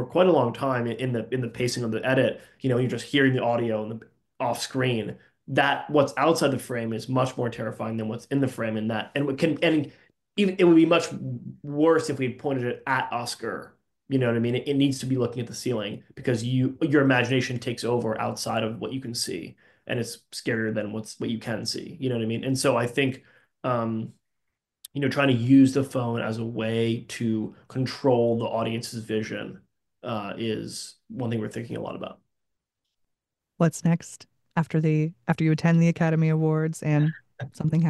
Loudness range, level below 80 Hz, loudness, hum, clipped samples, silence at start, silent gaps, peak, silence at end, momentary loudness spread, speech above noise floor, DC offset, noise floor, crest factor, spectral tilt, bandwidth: 7 LU; -64 dBFS; -25 LUFS; none; under 0.1%; 0 s; none; -6 dBFS; 0 s; 13 LU; 58 dB; under 0.1%; -83 dBFS; 18 dB; -6 dB/octave; 12.5 kHz